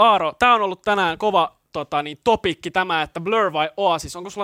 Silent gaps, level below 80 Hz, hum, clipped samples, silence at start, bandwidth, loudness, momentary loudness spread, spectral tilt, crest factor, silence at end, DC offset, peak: none; -52 dBFS; none; under 0.1%; 0 s; 16 kHz; -20 LUFS; 9 LU; -4 dB/octave; 16 dB; 0 s; under 0.1%; -4 dBFS